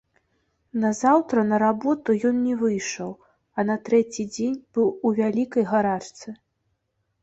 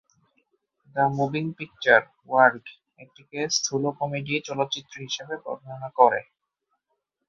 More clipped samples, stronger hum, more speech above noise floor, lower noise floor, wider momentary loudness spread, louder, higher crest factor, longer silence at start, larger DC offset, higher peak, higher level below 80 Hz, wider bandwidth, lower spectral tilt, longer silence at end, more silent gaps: neither; neither; about the same, 51 dB vs 54 dB; second, -74 dBFS vs -78 dBFS; about the same, 13 LU vs 15 LU; about the same, -23 LUFS vs -24 LUFS; second, 18 dB vs 24 dB; second, 0.75 s vs 0.95 s; neither; second, -6 dBFS vs -2 dBFS; first, -64 dBFS vs -70 dBFS; about the same, 8 kHz vs 7.6 kHz; first, -5.5 dB/octave vs -3.5 dB/octave; second, 0.9 s vs 1.05 s; neither